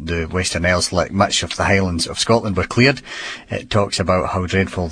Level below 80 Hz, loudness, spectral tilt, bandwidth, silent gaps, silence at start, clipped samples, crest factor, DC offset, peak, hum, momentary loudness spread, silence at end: -38 dBFS; -18 LUFS; -4.5 dB/octave; 10.5 kHz; none; 0 s; under 0.1%; 18 dB; under 0.1%; 0 dBFS; none; 8 LU; 0 s